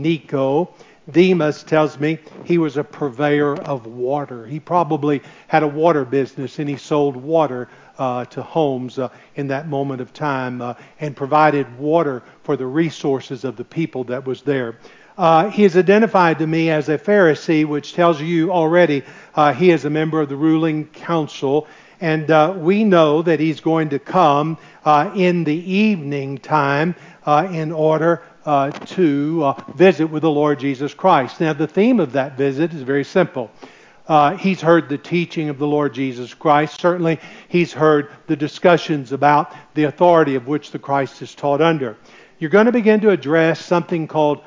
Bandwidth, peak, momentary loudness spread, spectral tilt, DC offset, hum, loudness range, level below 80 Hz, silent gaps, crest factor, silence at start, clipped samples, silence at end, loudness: 7.6 kHz; 0 dBFS; 11 LU; -7 dB/octave; under 0.1%; none; 5 LU; -66 dBFS; none; 16 dB; 0 s; under 0.1%; 0.05 s; -18 LUFS